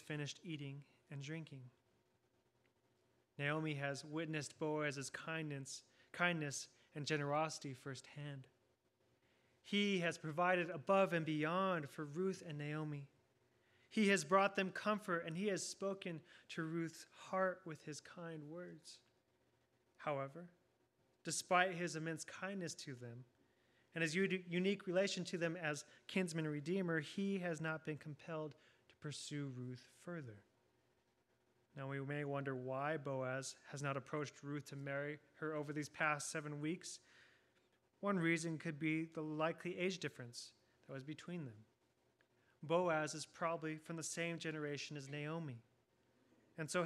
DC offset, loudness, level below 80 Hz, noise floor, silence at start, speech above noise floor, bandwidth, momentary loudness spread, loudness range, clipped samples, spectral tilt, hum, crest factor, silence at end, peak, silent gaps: under 0.1%; -42 LUFS; -90 dBFS; -80 dBFS; 0 s; 38 dB; 14 kHz; 15 LU; 9 LU; under 0.1%; -4.5 dB/octave; none; 24 dB; 0 s; -20 dBFS; none